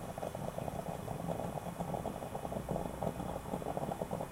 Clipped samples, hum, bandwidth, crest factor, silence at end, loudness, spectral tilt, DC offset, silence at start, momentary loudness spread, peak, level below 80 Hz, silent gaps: under 0.1%; none; 16 kHz; 18 dB; 0 s; -41 LUFS; -6.5 dB/octave; under 0.1%; 0 s; 3 LU; -22 dBFS; -54 dBFS; none